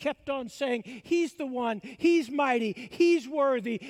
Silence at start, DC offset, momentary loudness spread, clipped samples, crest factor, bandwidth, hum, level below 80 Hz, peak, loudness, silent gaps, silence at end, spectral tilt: 0 s; under 0.1%; 9 LU; under 0.1%; 14 dB; 11 kHz; none; -70 dBFS; -14 dBFS; -28 LUFS; none; 0 s; -5 dB/octave